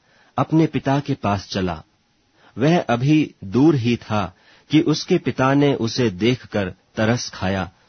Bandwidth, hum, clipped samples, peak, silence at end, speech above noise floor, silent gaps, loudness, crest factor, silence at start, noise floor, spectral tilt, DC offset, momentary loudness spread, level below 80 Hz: 6.6 kHz; none; under 0.1%; -2 dBFS; 0.2 s; 42 dB; none; -20 LUFS; 18 dB; 0.35 s; -62 dBFS; -6.5 dB/octave; under 0.1%; 9 LU; -52 dBFS